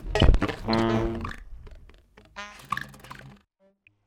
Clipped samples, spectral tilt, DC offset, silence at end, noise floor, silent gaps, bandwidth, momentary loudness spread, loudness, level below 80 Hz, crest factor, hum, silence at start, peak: under 0.1%; -6.5 dB/octave; under 0.1%; 0.75 s; -64 dBFS; none; 12.5 kHz; 23 LU; -27 LUFS; -32 dBFS; 24 dB; none; 0 s; -2 dBFS